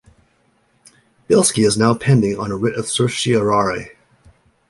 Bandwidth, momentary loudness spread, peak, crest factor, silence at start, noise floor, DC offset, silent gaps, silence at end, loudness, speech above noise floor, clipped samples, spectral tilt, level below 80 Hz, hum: 11.5 kHz; 7 LU; -2 dBFS; 16 dB; 1.3 s; -60 dBFS; under 0.1%; none; 0.8 s; -17 LUFS; 44 dB; under 0.1%; -5 dB/octave; -50 dBFS; none